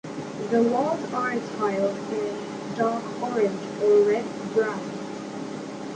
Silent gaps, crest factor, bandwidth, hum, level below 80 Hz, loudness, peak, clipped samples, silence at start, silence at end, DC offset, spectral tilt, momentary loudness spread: none; 16 dB; 9.4 kHz; none; -68 dBFS; -26 LUFS; -10 dBFS; under 0.1%; 0.05 s; 0 s; under 0.1%; -6 dB/octave; 13 LU